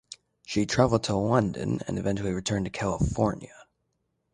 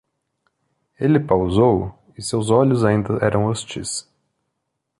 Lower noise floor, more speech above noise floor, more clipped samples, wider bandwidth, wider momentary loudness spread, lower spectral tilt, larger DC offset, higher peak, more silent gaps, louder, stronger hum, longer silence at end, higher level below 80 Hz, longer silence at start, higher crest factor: about the same, -76 dBFS vs -77 dBFS; second, 50 dB vs 59 dB; neither; about the same, 11 kHz vs 11.5 kHz; second, 8 LU vs 11 LU; about the same, -6 dB/octave vs -6 dB/octave; neither; second, -8 dBFS vs -2 dBFS; neither; second, -27 LUFS vs -19 LUFS; neither; second, 0.7 s vs 1 s; about the same, -44 dBFS vs -44 dBFS; second, 0.1 s vs 1 s; about the same, 20 dB vs 18 dB